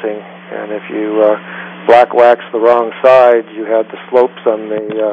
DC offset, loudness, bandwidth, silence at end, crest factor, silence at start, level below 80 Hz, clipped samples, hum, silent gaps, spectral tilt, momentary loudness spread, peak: under 0.1%; -11 LUFS; 6.8 kHz; 0 s; 12 dB; 0 s; -64 dBFS; 0.4%; none; none; -6.5 dB/octave; 15 LU; 0 dBFS